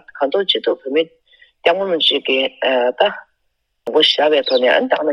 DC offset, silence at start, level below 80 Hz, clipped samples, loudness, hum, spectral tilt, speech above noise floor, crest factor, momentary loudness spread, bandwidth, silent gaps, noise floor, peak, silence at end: under 0.1%; 0.15 s; -70 dBFS; under 0.1%; -16 LUFS; none; -3.5 dB/octave; 53 dB; 16 dB; 6 LU; 10.5 kHz; none; -69 dBFS; 0 dBFS; 0 s